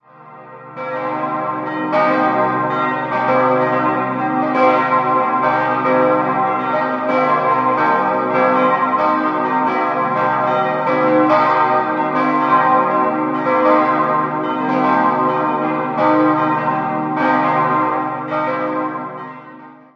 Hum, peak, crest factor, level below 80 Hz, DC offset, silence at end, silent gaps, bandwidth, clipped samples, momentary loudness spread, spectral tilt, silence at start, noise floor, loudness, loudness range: none; 0 dBFS; 16 dB; -64 dBFS; under 0.1%; 0.2 s; none; 6.8 kHz; under 0.1%; 7 LU; -8 dB/octave; 0.2 s; -39 dBFS; -16 LUFS; 2 LU